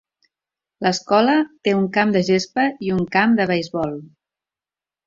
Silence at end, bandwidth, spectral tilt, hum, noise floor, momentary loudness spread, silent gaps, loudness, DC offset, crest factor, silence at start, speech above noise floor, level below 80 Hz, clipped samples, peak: 1 s; 7.6 kHz; -5.5 dB/octave; none; under -90 dBFS; 8 LU; none; -19 LUFS; under 0.1%; 18 dB; 0.8 s; over 71 dB; -58 dBFS; under 0.1%; -2 dBFS